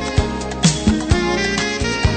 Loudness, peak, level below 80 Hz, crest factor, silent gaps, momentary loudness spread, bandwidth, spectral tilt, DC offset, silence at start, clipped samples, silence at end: -18 LUFS; -2 dBFS; -26 dBFS; 16 dB; none; 4 LU; 9.2 kHz; -4.5 dB/octave; under 0.1%; 0 s; under 0.1%; 0 s